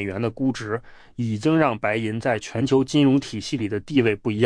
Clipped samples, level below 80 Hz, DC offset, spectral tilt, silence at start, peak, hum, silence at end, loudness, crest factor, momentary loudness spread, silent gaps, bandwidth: under 0.1%; -54 dBFS; under 0.1%; -6.5 dB/octave; 0 s; -6 dBFS; none; 0 s; -23 LUFS; 16 dB; 10 LU; none; 10.5 kHz